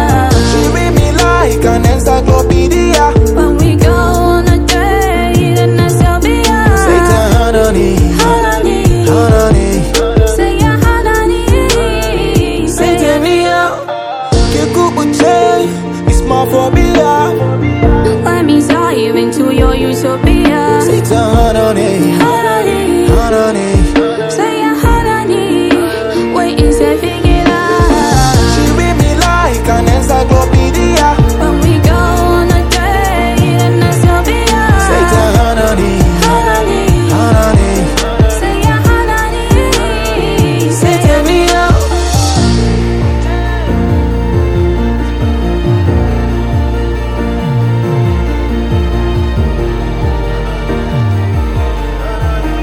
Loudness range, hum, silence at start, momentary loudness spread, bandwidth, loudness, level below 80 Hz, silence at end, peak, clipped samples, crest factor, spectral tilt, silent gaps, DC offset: 4 LU; none; 0 s; 5 LU; 16.5 kHz; -10 LUFS; -16 dBFS; 0 s; 0 dBFS; 0.6%; 8 dB; -5.5 dB/octave; none; under 0.1%